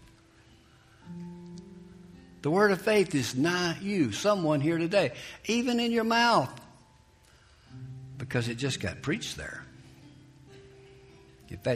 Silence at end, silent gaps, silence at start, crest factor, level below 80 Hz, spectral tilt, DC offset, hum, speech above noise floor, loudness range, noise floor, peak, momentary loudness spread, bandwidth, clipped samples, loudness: 0 s; none; 1.05 s; 20 dB; -60 dBFS; -5 dB/octave; under 0.1%; none; 32 dB; 9 LU; -59 dBFS; -12 dBFS; 22 LU; 15.5 kHz; under 0.1%; -28 LUFS